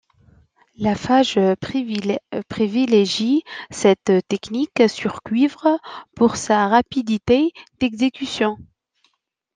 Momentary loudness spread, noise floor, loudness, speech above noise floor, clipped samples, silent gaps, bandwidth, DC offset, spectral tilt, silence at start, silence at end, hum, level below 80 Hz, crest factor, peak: 8 LU; -69 dBFS; -19 LUFS; 50 dB; under 0.1%; none; 9.8 kHz; under 0.1%; -5 dB/octave; 0.8 s; 0.9 s; none; -54 dBFS; 18 dB; -2 dBFS